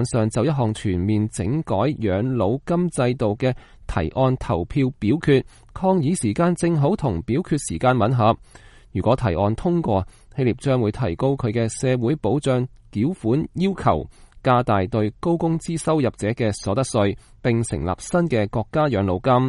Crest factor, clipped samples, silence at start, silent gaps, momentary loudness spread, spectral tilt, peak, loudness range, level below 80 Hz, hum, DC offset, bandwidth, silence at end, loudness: 16 dB; under 0.1%; 0 s; none; 5 LU; -7 dB/octave; -4 dBFS; 2 LU; -42 dBFS; none; under 0.1%; 11.5 kHz; 0 s; -22 LUFS